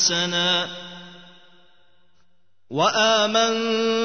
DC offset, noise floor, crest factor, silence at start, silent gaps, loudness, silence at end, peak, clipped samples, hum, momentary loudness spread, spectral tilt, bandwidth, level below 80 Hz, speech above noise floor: 0.3%; -69 dBFS; 18 dB; 0 s; none; -20 LUFS; 0 s; -6 dBFS; under 0.1%; none; 18 LU; -2 dB/octave; 6.6 kHz; -72 dBFS; 49 dB